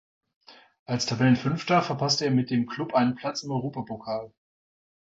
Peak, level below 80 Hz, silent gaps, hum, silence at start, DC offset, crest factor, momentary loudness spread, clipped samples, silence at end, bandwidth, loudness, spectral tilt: -10 dBFS; -62 dBFS; 0.79-0.86 s; none; 0.5 s; under 0.1%; 18 dB; 11 LU; under 0.1%; 0.75 s; 7.8 kHz; -26 LUFS; -5.5 dB/octave